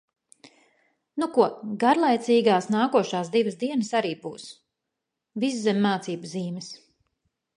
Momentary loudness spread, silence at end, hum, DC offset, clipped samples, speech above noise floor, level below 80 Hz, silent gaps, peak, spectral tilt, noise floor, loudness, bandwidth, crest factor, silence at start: 17 LU; 0.8 s; none; under 0.1%; under 0.1%; 60 dB; -76 dBFS; none; -6 dBFS; -5.5 dB/octave; -84 dBFS; -24 LUFS; 11 kHz; 20 dB; 1.15 s